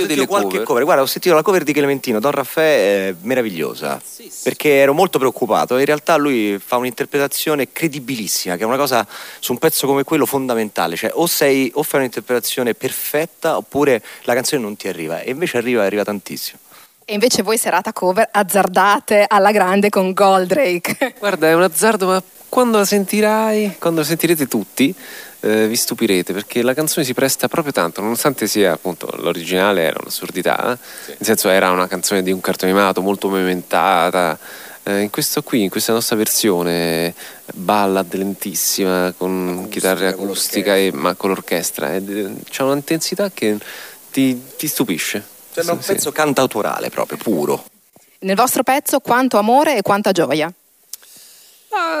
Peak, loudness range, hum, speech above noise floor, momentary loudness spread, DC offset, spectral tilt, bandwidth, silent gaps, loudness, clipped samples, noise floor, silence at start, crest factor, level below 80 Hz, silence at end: -2 dBFS; 5 LU; none; 34 dB; 10 LU; under 0.1%; -3.5 dB/octave; 16 kHz; none; -17 LUFS; under 0.1%; -51 dBFS; 0 s; 16 dB; -62 dBFS; 0 s